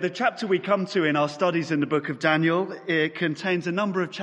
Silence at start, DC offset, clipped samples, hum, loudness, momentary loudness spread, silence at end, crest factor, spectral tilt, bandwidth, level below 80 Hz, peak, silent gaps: 0 s; under 0.1%; under 0.1%; none; -24 LUFS; 4 LU; 0 s; 18 dB; -6 dB/octave; 9.8 kHz; -74 dBFS; -6 dBFS; none